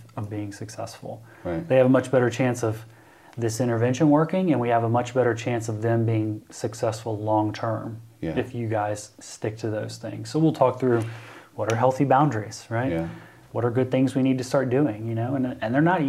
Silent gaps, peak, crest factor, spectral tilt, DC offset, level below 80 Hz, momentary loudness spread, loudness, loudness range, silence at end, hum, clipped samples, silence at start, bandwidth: none; -6 dBFS; 18 dB; -7 dB/octave; under 0.1%; -62 dBFS; 15 LU; -24 LUFS; 5 LU; 0 s; none; under 0.1%; 0 s; 14 kHz